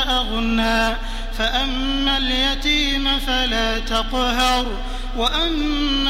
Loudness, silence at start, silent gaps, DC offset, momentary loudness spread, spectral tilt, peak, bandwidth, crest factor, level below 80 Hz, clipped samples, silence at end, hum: -20 LUFS; 0 s; none; under 0.1%; 5 LU; -3 dB/octave; -4 dBFS; 15.5 kHz; 16 dB; -26 dBFS; under 0.1%; 0 s; none